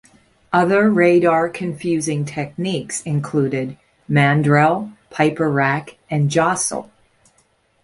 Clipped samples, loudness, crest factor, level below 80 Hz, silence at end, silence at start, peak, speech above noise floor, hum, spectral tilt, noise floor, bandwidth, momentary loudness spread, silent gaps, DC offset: under 0.1%; -18 LUFS; 16 dB; -56 dBFS; 1 s; 0.5 s; -2 dBFS; 43 dB; none; -5.5 dB/octave; -60 dBFS; 11.5 kHz; 11 LU; none; under 0.1%